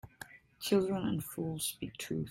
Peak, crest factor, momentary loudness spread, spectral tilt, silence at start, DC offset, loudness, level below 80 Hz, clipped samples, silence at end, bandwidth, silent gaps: -16 dBFS; 20 dB; 20 LU; -5 dB/octave; 0.05 s; under 0.1%; -35 LUFS; -64 dBFS; under 0.1%; 0 s; 16.5 kHz; none